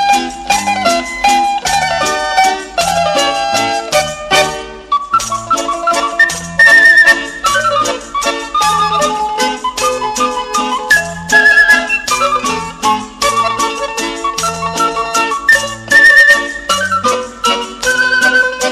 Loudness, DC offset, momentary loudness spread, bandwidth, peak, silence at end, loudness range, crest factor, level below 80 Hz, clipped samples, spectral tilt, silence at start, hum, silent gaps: -11 LUFS; under 0.1%; 10 LU; 15 kHz; 0 dBFS; 0 s; 5 LU; 12 dB; -40 dBFS; under 0.1%; -1.5 dB/octave; 0 s; none; none